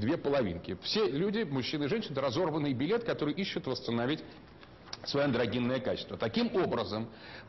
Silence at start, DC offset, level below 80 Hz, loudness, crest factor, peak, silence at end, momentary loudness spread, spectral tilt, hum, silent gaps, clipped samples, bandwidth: 0 s; under 0.1%; -62 dBFS; -32 LUFS; 14 dB; -20 dBFS; 0 s; 7 LU; -6.5 dB/octave; none; none; under 0.1%; 6.2 kHz